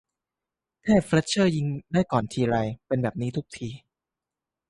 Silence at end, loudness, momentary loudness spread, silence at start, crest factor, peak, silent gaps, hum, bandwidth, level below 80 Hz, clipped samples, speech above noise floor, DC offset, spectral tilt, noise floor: 0.95 s; -25 LUFS; 15 LU; 0.85 s; 18 dB; -8 dBFS; none; none; 11.5 kHz; -54 dBFS; under 0.1%; 64 dB; under 0.1%; -6 dB/octave; -89 dBFS